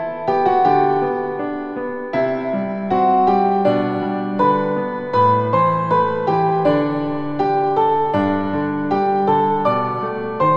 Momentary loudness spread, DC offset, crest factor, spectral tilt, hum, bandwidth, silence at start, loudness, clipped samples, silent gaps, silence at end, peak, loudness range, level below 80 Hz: 8 LU; under 0.1%; 14 dB; -9 dB/octave; none; 7 kHz; 0 s; -18 LUFS; under 0.1%; none; 0 s; -4 dBFS; 2 LU; -56 dBFS